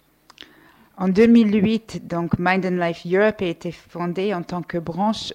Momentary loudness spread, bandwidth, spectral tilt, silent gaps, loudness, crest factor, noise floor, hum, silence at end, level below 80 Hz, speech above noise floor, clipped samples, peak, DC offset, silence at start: 13 LU; 9.4 kHz; -7 dB/octave; none; -20 LUFS; 16 dB; -52 dBFS; none; 0 s; -52 dBFS; 32 dB; under 0.1%; -6 dBFS; under 0.1%; 1 s